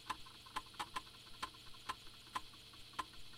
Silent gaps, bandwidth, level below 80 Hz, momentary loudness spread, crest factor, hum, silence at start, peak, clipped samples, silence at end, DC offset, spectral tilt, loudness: none; 16 kHz; -66 dBFS; 5 LU; 22 dB; none; 0 s; -28 dBFS; under 0.1%; 0 s; under 0.1%; -1.5 dB/octave; -49 LUFS